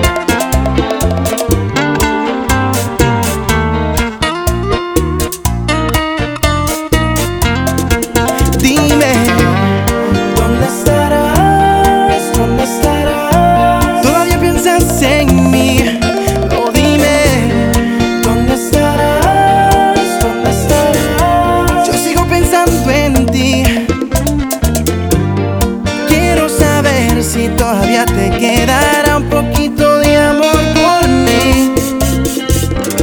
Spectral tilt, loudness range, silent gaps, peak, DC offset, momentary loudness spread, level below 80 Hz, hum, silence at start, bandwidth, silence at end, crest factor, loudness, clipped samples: -5 dB/octave; 4 LU; none; 0 dBFS; under 0.1%; 5 LU; -20 dBFS; none; 0 s; over 20 kHz; 0 s; 10 dB; -11 LUFS; under 0.1%